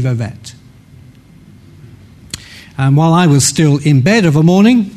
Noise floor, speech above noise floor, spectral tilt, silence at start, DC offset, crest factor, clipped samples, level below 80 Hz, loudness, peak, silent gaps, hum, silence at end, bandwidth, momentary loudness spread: -40 dBFS; 30 dB; -5.5 dB/octave; 0 s; under 0.1%; 12 dB; under 0.1%; -46 dBFS; -10 LUFS; 0 dBFS; none; none; 0.05 s; 13.5 kHz; 20 LU